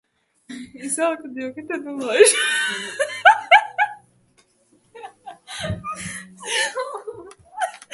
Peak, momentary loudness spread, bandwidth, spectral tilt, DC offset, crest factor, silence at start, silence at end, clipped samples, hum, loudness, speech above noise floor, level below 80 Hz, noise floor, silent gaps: 0 dBFS; 24 LU; 12 kHz; -1.5 dB/octave; under 0.1%; 22 dB; 0.5 s; 0.15 s; under 0.1%; none; -20 LUFS; 40 dB; -54 dBFS; -60 dBFS; none